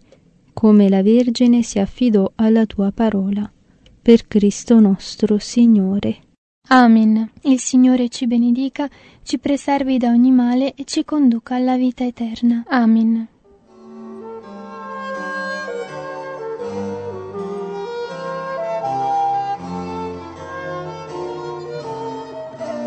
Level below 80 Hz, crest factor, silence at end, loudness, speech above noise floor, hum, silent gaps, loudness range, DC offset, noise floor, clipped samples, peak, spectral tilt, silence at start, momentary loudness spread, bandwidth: -50 dBFS; 18 dB; 0 s; -17 LUFS; 37 dB; none; 6.38-6.62 s; 12 LU; under 0.1%; -51 dBFS; under 0.1%; 0 dBFS; -6 dB/octave; 0.55 s; 16 LU; 8.8 kHz